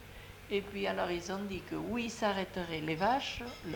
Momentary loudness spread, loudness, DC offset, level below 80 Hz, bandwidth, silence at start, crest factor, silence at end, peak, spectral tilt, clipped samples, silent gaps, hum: 8 LU; -36 LUFS; under 0.1%; -56 dBFS; 19 kHz; 0 s; 20 dB; 0 s; -16 dBFS; -4.5 dB/octave; under 0.1%; none; none